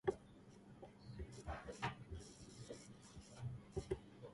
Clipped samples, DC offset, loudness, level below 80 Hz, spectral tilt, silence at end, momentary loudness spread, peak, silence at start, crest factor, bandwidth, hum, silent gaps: under 0.1%; under 0.1%; -52 LUFS; -60 dBFS; -5.5 dB/octave; 0 s; 13 LU; -24 dBFS; 0.05 s; 26 dB; 11.5 kHz; none; none